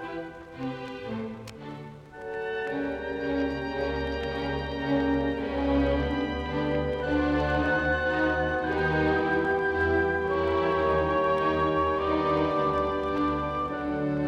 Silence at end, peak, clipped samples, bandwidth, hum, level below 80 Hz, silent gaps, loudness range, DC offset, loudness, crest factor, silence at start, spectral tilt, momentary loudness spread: 0 s; -14 dBFS; under 0.1%; 8.8 kHz; none; -42 dBFS; none; 7 LU; under 0.1%; -27 LUFS; 14 dB; 0 s; -7.5 dB/octave; 11 LU